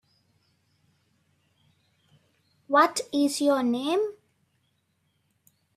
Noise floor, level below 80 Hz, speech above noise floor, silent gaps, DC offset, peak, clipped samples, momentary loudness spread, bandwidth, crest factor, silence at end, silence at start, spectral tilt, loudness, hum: -72 dBFS; -78 dBFS; 49 dB; none; under 0.1%; -8 dBFS; under 0.1%; 6 LU; 14.5 kHz; 22 dB; 1.65 s; 2.7 s; -2.5 dB/octave; -25 LUFS; none